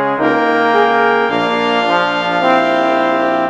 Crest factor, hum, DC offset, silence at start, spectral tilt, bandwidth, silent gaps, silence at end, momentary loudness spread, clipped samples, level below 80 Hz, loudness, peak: 14 dB; none; under 0.1%; 0 s; -5 dB/octave; 9.4 kHz; none; 0 s; 3 LU; under 0.1%; -60 dBFS; -13 LUFS; 0 dBFS